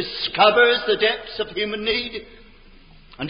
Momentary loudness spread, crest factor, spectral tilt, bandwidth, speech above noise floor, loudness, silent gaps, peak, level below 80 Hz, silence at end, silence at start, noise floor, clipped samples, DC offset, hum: 13 LU; 18 dB; -8 dB/octave; 5.4 kHz; 27 dB; -19 LUFS; none; -4 dBFS; -50 dBFS; 0 s; 0 s; -47 dBFS; under 0.1%; under 0.1%; none